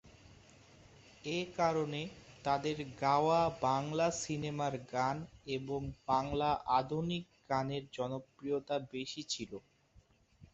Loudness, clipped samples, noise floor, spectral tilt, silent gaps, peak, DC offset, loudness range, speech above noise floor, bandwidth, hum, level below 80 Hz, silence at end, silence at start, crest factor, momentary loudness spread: -36 LUFS; under 0.1%; -67 dBFS; -4.5 dB/octave; none; -16 dBFS; under 0.1%; 5 LU; 31 dB; 8 kHz; none; -62 dBFS; 0.1 s; 0.05 s; 20 dB; 11 LU